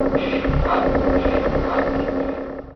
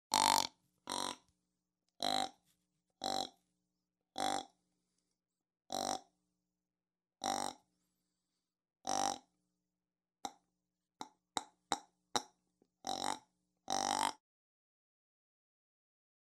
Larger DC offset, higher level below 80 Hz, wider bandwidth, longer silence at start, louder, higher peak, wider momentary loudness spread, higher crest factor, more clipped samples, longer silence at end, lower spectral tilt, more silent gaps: neither; first, -28 dBFS vs -84 dBFS; second, 6.2 kHz vs 16 kHz; about the same, 0 s vs 0.1 s; first, -21 LUFS vs -39 LUFS; first, -4 dBFS vs -8 dBFS; second, 6 LU vs 15 LU; second, 16 dB vs 34 dB; neither; second, 0 s vs 2.1 s; first, -8.5 dB/octave vs -1 dB/octave; neither